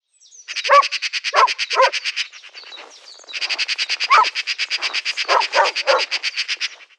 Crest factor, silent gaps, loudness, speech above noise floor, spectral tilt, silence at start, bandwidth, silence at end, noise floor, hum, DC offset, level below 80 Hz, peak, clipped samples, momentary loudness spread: 18 dB; none; -18 LUFS; 24 dB; 5 dB/octave; 0.5 s; 10.5 kHz; 0.15 s; -43 dBFS; none; under 0.1%; under -90 dBFS; -2 dBFS; under 0.1%; 14 LU